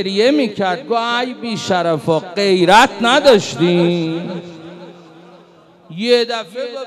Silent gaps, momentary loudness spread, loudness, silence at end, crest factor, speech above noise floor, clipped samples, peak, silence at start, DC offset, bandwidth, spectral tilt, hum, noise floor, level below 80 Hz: none; 17 LU; -15 LUFS; 0 s; 14 dB; 31 dB; under 0.1%; 0 dBFS; 0 s; under 0.1%; 15.5 kHz; -5 dB/octave; none; -46 dBFS; -54 dBFS